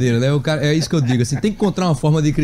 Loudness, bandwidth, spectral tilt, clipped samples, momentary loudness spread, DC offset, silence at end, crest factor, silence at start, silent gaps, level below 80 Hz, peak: -17 LUFS; 13 kHz; -6.5 dB/octave; under 0.1%; 2 LU; under 0.1%; 0 s; 10 dB; 0 s; none; -38 dBFS; -6 dBFS